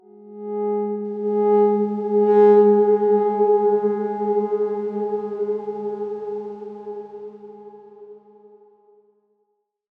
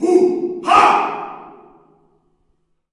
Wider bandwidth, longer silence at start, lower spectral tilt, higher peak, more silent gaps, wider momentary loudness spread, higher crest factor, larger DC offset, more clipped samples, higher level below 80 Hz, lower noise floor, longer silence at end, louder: second, 3.1 kHz vs 11 kHz; first, 0.2 s vs 0 s; first, -10.5 dB/octave vs -4 dB/octave; second, -6 dBFS vs 0 dBFS; neither; about the same, 20 LU vs 20 LU; about the same, 16 dB vs 18 dB; neither; neither; second, -78 dBFS vs -58 dBFS; first, -72 dBFS vs -64 dBFS; first, 1.8 s vs 1.4 s; second, -20 LUFS vs -14 LUFS